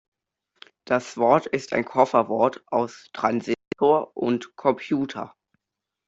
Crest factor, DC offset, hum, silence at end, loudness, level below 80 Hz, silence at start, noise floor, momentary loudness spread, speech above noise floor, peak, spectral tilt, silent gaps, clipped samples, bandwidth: 20 dB; under 0.1%; none; 0.8 s; -24 LUFS; -66 dBFS; 0.9 s; -85 dBFS; 8 LU; 63 dB; -4 dBFS; -6 dB/octave; none; under 0.1%; 8 kHz